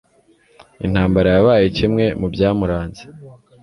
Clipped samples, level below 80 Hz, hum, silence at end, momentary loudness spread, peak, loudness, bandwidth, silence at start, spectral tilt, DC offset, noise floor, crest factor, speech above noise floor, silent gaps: under 0.1%; -36 dBFS; none; 0.3 s; 13 LU; -2 dBFS; -16 LUFS; 11 kHz; 0.8 s; -8 dB/octave; under 0.1%; -55 dBFS; 16 dB; 39 dB; none